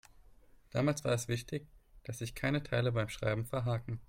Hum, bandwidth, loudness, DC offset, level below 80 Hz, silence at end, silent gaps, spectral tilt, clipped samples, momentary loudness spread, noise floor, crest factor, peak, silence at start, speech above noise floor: none; 16.5 kHz; -35 LUFS; under 0.1%; -58 dBFS; 0.05 s; none; -5.5 dB/octave; under 0.1%; 10 LU; -60 dBFS; 18 dB; -18 dBFS; 0.75 s; 26 dB